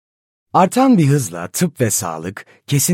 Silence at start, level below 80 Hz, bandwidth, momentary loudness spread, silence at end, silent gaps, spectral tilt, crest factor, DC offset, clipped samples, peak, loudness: 0.55 s; -58 dBFS; 16.5 kHz; 15 LU; 0 s; none; -5 dB/octave; 16 dB; under 0.1%; under 0.1%; -2 dBFS; -16 LUFS